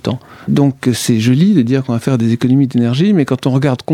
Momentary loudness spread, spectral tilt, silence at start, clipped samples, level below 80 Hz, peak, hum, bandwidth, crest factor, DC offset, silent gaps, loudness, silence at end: 5 LU; -6.5 dB/octave; 0.05 s; under 0.1%; -52 dBFS; 0 dBFS; none; 16 kHz; 12 dB; under 0.1%; none; -13 LUFS; 0 s